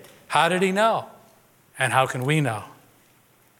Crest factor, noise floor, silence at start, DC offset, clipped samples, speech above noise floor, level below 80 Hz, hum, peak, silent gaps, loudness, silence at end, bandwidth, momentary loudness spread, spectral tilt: 20 dB; -58 dBFS; 0.3 s; under 0.1%; under 0.1%; 37 dB; -72 dBFS; none; -4 dBFS; none; -22 LUFS; 0.9 s; 17.5 kHz; 8 LU; -5 dB/octave